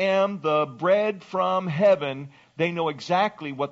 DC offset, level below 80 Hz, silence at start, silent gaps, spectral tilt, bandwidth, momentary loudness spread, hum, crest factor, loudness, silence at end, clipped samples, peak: under 0.1%; -72 dBFS; 0 s; none; -4 dB/octave; 7.6 kHz; 9 LU; none; 14 dB; -24 LUFS; 0 s; under 0.1%; -8 dBFS